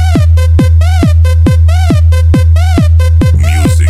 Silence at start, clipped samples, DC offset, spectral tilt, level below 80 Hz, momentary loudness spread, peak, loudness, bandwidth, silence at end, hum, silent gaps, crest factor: 0 s; under 0.1%; under 0.1%; -7 dB/octave; -10 dBFS; 1 LU; 0 dBFS; -8 LUFS; 12.5 kHz; 0 s; none; none; 6 dB